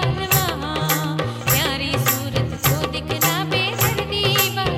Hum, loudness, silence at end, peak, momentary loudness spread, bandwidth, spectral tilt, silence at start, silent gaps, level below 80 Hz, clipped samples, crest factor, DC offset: none; -19 LUFS; 0 s; -4 dBFS; 5 LU; 17 kHz; -3.5 dB/octave; 0 s; none; -38 dBFS; under 0.1%; 16 dB; under 0.1%